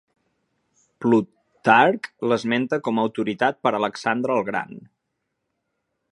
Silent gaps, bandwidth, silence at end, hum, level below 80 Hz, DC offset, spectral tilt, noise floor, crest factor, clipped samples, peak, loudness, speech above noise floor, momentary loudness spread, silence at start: none; 11 kHz; 1.35 s; none; -70 dBFS; under 0.1%; -6 dB/octave; -78 dBFS; 22 dB; under 0.1%; 0 dBFS; -22 LUFS; 57 dB; 11 LU; 1 s